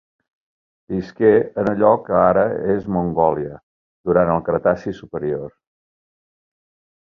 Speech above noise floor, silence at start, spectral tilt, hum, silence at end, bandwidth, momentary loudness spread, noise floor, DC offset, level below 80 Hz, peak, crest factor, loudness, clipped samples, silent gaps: over 72 dB; 0.9 s; -9.5 dB/octave; none; 1.5 s; 6.4 kHz; 13 LU; under -90 dBFS; under 0.1%; -48 dBFS; -2 dBFS; 18 dB; -19 LUFS; under 0.1%; 3.63-4.04 s